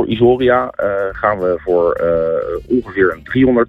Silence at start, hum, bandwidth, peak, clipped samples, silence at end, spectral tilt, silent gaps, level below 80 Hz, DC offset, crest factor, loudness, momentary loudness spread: 0 s; none; 4.6 kHz; 0 dBFS; under 0.1%; 0 s; -9 dB/octave; none; -40 dBFS; under 0.1%; 14 dB; -15 LUFS; 6 LU